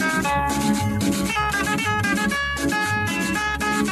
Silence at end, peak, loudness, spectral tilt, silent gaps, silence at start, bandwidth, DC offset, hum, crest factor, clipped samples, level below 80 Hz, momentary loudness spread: 0 s; -8 dBFS; -22 LUFS; -4 dB/octave; none; 0 s; 14 kHz; under 0.1%; none; 14 dB; under 0.1%; -40 dBFS; 1 LU